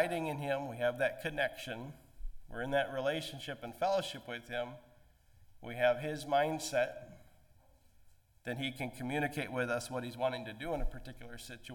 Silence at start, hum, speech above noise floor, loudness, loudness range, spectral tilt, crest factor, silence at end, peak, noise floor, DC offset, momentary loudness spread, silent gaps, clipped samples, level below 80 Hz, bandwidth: 0 s; none; 28 dB; -36 LUFS; 3 LU; -4.5 dB/octave; 22 dB; 0 s; -16 dBFS; -64 dBFS; under 0.1%; 17 LU; none; under 0.1%; -52 dBFS; 17.5 kHz